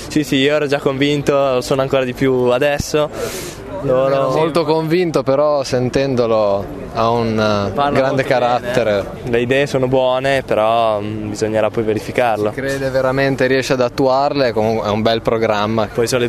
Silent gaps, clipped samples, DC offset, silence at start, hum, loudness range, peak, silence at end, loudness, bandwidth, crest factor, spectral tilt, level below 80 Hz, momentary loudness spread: none; under 0.1%; under 0.1%; 0 s; none; 1 LU; 0 dBFS; 0 s; -16 LUFS; 13.5 kHz; 16 dB; -5.5 dB/octave; -42 dBFS; 4 LU